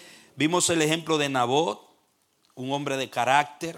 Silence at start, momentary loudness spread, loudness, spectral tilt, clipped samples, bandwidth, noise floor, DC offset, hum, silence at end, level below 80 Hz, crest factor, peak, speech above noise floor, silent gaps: 0 s; 9 LU; -24 LUFS; -3.5 dB/octave; under 0.1%; 17 kHz; -68 dBFS; under 0.1%; none; 0 s; -70 dBFS; 20 dB; -6 dBFS; 43 dB; none